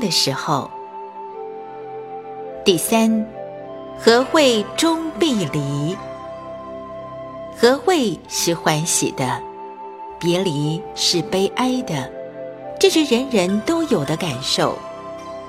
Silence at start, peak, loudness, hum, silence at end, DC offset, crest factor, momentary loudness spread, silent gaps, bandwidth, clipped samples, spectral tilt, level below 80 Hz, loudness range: 0 s; 0 dBFS; -19 LUFS; none; 0 s; under 0.1%; 20 dB; 17 LU; none; 16.5 kHz; under 0.1%; -4 dB/octave; -54 dBFS; 4 LU